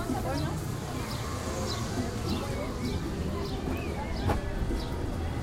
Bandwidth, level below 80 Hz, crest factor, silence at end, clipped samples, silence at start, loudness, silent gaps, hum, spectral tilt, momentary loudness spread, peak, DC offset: 16 kHz; -38 dBFS; 18 dB; 0 s; under 0.1%; 0 s; -33 LUFS; none; none; -5.5 dB/octave; 3 LU; -14 dBFS; under 0.1%